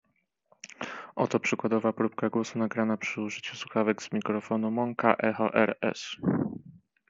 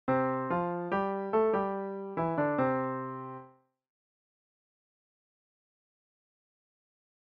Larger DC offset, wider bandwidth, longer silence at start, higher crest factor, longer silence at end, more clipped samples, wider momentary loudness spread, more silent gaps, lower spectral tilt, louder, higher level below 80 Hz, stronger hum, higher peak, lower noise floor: neither; first, 7.8 kHz vs 5.4 kHz; first, 0.65 s vs 0.05 s; first, 26 dB vs 18 dB; second, 0.3 s vs 3.9 s; neither; about the same, 11 LU vs 11 LU; neither; second, -4.5 dB/octave vs -7 dB/octave; about the same, -29 LUFS vs -31 LUFS; about the same, -74 dBFS vs -70 dBFS; neither; first, -4 dBFS vs -16 dBFS; first, -68 dBFS vs -57 dBFS